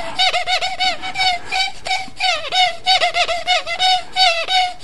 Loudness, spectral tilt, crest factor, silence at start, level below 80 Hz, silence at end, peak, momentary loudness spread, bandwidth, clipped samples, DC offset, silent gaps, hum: -16 LUFS; 0.5 dB/octave; 16 dB; 0 s; -46 dBFS; 0 s; -2 dBFS; 5 LU; 11.5 kHz; under 0.1%; 4%; none; none